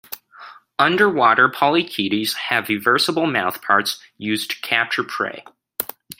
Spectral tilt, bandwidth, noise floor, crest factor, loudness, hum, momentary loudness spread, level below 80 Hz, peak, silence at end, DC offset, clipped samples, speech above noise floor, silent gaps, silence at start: -3.5 dB/octave; 16.5 kHz; -43 dBFS; 20 dB; -19 LUFS; none; 13 LU; -66 dBFS; 0 dBFS; 0.05 s; under 0.1%; under 0.1%; 24 dB; none; 0.1 s